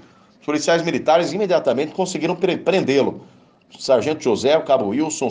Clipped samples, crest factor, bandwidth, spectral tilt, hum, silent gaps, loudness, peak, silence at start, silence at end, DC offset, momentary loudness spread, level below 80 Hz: under 0.1%; 16 dB; 10 kHz; -4.5 dB/octave; none; none; -19 LUFS; -4 dBFS; 0.5 s; 0 s; under 0.1%; 6 LU; -64 dBFS